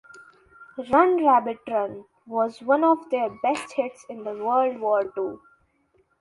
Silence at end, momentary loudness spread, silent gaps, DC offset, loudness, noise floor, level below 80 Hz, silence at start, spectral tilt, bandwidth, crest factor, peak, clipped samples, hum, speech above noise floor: 0.85 s; 14 LU; none; under 0.1%; -23 LUFS; -66 dBFS; -66 dBFS; 0.15 s; -5.5 dB/octave; 11.5 kHz; 20 dB; -4 dBFS; under 0.1%; none; 43 dB